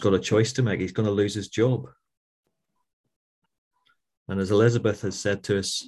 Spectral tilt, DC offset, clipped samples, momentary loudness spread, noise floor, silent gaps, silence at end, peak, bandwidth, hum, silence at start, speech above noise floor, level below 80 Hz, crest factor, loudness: -5.5 dB/octave; under 0.1%; under 0.1%; 7 LU; -78 dBFS; 2.17-2.43 s, 2.93-3.04 s, 3.16-3.42 s, 3.58-3.71 s, 4.17-4.26 s; 0 s; -6 dBFS; 12.5 kHz; none; 0 s; 54 dB; -52 dBFS; 20 dB; -24 LUFS